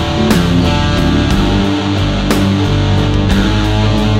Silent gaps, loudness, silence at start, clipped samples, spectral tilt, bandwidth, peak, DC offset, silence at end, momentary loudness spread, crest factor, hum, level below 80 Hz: none; -12 LUFS; 0 s; under 0.1%; -6 dB/octave; 16 kHz; 0 dBFS; under 0.1%; 0 s; 2 LU; 12 dB; none; -20 dBFS